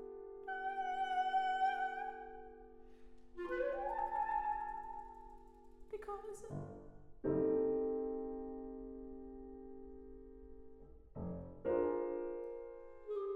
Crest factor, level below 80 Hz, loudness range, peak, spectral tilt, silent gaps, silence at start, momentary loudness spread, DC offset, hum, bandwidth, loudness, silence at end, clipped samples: 18 dB; -62 dBFS; 6 LU; -24 dBFS; -6.5 dB/octave; none; 0 s; 21 LU; under 0.1%; none; 11.5 kHz; -41 LUFS; 0 s; under 0.1%